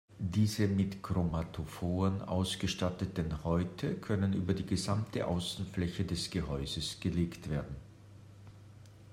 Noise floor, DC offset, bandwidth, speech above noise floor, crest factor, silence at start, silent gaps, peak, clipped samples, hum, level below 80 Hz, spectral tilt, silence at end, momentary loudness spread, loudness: -54 dBFS; under 0.1%; 16 kHz; 20 dB; 18 dB; 0.1 s; none; -18 dBFS; under 0.1%; none; -52 dBFS; -6 dB/octave; 0 s; 13 LU; -35 LUFS